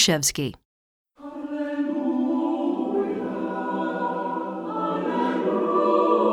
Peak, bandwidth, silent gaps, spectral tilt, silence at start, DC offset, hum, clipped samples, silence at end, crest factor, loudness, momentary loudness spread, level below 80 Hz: -4 dBFS; 18 kHz; 0.65-1.05 s; -4 dB/octave; 0 s; under 0.1%; none; under 0.1%; 0 s; 20 dB; -25 LUFS; 11 LU; -60 dBFS